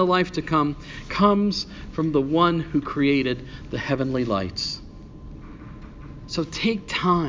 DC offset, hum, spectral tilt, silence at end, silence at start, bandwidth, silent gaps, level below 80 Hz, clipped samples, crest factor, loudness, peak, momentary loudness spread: under 0.1%; none; -6 dB/octave; 0 s; 0 s; 7.6 kHz; none; -44 dBFS; under 0.1%; 18 dB; -23 LUFS; -6 dBFS; 21 LU